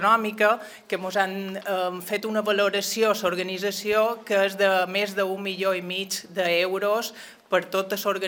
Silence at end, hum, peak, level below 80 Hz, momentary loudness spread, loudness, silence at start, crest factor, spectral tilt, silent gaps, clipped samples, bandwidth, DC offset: 0 s; none; -6 dBFS; -74 dBFS; 7 LU; -25 LUFS; 0 s; 18 dB; -3 dB/octave; none; under 0.1%; 19.5 kHz; under 0.1%